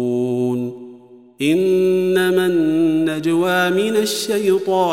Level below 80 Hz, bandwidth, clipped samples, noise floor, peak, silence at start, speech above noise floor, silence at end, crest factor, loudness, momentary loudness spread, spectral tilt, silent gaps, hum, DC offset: -70 dBFS; 16.5 kHz; under 0.1%; -43 dBFS; -4 dBFS; 0 s; 26 dB; 0 s; 12 dB; -17 LUFS; 6 LU; -5 dB/octave; none; none; 0.2%